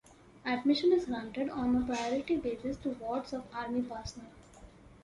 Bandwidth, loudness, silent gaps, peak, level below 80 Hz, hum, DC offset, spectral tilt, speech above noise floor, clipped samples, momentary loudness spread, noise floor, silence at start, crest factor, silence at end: 11.5 kHz; -33 LUFS; none; -16 dBFS; -56 dBFS; none; under 0.1%; -5 dB/octave; 22 dB; under 0.1%; 13 LU; -55 dBFS; 0.1 s; 16 dB; 0.05 s